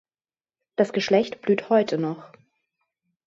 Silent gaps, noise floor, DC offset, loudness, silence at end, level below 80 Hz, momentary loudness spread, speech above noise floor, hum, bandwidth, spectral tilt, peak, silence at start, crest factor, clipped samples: none; under -90 dBFS; under 0.1%; -23 LUFS; 1 s; -72 dBFS; 11 LU; over 68 dB; none; 7.8 kHz; -6 dB/octave; -6 dBFS; 0.8 s; 18 dB; under 0.1%